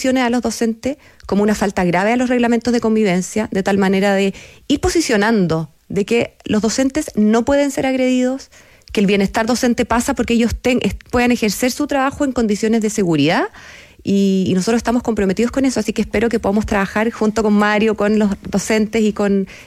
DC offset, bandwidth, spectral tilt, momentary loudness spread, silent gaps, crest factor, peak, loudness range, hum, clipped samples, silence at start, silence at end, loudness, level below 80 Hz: under 0.1%; 15 kHz; -5 dB/octave; 5 LU; none; 12 dB; -4 dBFS; 1 LU; none; under 0.1%; 0 s; 0.05 s; -17 LUFS; -40 dBFS